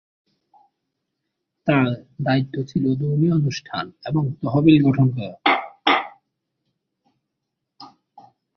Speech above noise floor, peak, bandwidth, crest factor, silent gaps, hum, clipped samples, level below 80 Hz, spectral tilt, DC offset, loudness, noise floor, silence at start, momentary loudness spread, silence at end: 60 dB; -2 dBFS; 6.6 kHz; 20 dB; none; none; under 0.1%; -58 dBFS; -7.5 dB/octave; under 0.1%; -20 LUFS; -80 dBFS; 1.65 s; 12 LU; 0.7 s